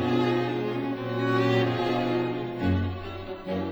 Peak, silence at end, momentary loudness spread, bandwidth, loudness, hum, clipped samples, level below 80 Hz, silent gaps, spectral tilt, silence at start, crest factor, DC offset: -12 dBFS; 0 s; 9 LU; over 20 kHz; -27 LUFS; none; under 0.1%; -52 dBFS; none; -7.5 dB/octave; 0 s; 14 dB; under 0.1%